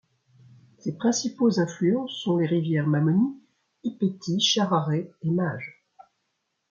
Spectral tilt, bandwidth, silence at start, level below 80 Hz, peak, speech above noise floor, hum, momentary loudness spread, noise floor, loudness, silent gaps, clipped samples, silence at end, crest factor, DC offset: -5.5 dB/octave; 7.4 kHz; 0.85 s; -70 dBFS; -10 dBFS; 53 dB; none; 13 LU; -77 dBFS; -25 LUFS; none; under 0.1%; 1 s; 16 dB; under 0.1%